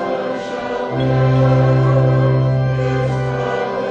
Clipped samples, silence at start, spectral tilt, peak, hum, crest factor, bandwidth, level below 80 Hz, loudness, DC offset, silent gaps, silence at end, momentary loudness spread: under 0.1%; 0 s; -8.5 dB/octave; -4 dBFS; none; 12 dB; 6.8 kHz; -38 dBFS; -16 LUFS; under 0.1%; none; 0 s; 9 LU